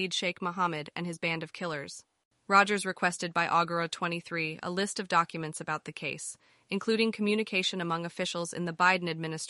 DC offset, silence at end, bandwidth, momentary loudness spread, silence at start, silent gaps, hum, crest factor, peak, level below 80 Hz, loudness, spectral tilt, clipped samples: under 0.1%; 0 s; 11.5 kHz; 11 LU; 0 s; 2.25-2.31 s; none; 22 dB; -8 dBFS; -76 dBFS; -30 LUFS; -4 dB/octave; under 0.1%